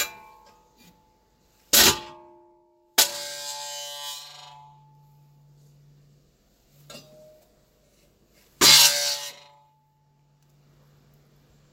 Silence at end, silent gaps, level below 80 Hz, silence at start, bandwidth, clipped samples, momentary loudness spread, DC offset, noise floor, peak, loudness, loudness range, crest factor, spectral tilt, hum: 2.4 s; none; -58 dBFS; 0 s; 16 kHz; under 0.1%; 24 LU; under 0.1%; -64 dBFS; -2 dBFS; -19 LUFS; 17 LU; 26 dB; 0.5 dB/octave; none